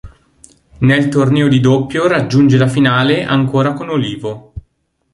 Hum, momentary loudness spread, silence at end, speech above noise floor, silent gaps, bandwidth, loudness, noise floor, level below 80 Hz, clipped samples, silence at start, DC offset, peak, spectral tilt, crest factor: none; 8 LU; 0.55 s; 49 dB; none; 11.5 kHz; -13 LUFS; -61 dBFS; -42 dBFS; under 0.1%; 0.05 s; under 0.1%; -2 dBFS; -7 dB/octave; 12 dB